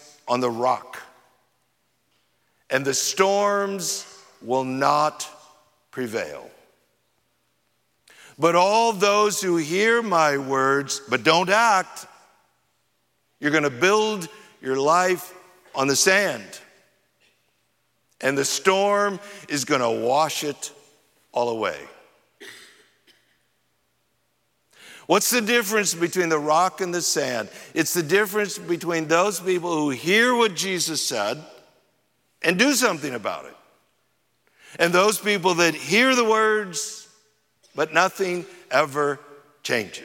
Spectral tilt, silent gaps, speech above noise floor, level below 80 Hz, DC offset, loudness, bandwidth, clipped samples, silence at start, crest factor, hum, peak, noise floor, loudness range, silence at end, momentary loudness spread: -3 dB/octave; none; 49 dB; -76 dBFS; under 0.1%; -21 LUFS; 16.5 kHz; under 0.1%; 0.25 s; 22 dB; none; -2 dBFS; -70 dBFS; 6 LU; 0 s; 17 LU